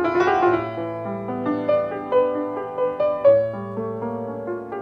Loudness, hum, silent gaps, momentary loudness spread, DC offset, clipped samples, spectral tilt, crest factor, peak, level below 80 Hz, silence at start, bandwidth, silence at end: -22 LUFS; none; none; 11 LU; under 0.1%; under 0.1%; -7.5 dB/octave; 16 dB; -6 dBFS; -58 dBFS; 0 s; 6.2 kHz; 0 s